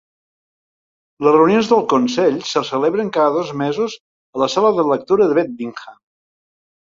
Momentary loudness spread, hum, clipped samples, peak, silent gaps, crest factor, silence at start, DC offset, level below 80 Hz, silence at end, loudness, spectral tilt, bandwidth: 12 LU; none; under 0.1%; 0 dBFS; 4.00-4.33 s; 16 dB; 1.2 s; under 0.1%; -60 dBFS; 1 s; -16 LUFS; -5.5 dB/octave; 7.6 kHz